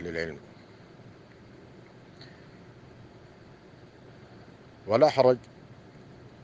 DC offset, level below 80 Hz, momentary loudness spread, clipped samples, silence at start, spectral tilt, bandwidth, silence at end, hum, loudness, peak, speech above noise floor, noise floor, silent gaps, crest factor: under 0.1%; -66 dBFS; 28 LU; under 0.1%; 0 s; -6.5 dB/octave; 7.8 kHz; 0.7 s; none; -25 LUFS; -6 dBFS; 28 dB; -52 dBFS; none; 26 dB